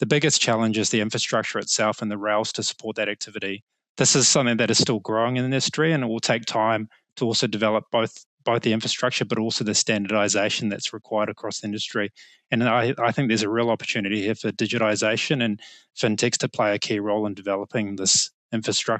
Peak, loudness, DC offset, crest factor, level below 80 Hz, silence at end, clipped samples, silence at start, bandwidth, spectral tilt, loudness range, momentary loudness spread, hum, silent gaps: -6 dBFS; -23 LUFS; under 0.1%; 18 dB; -70 dBFS; 0 s; under 0.1%; 0 s; 9.2 kHz; -3.5 dB/octave; 3 LU; 9 LU; none; 3.62-3.67 s, 3.89-3.95 s, 8.26-8.38 s, 18.34-18.49 s